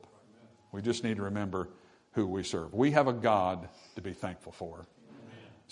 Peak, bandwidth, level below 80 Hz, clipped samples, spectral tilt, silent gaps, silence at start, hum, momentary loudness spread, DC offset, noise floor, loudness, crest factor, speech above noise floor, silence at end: -8 dBFS; 11 kHz; -68 dBFS; under 0.1%; -6 dB/octave; none; 0.45 s; none; 22 LU; under 0.1%; -60 dBFS; -32 LUFS; 26 dB; 28 dB; 0.2 s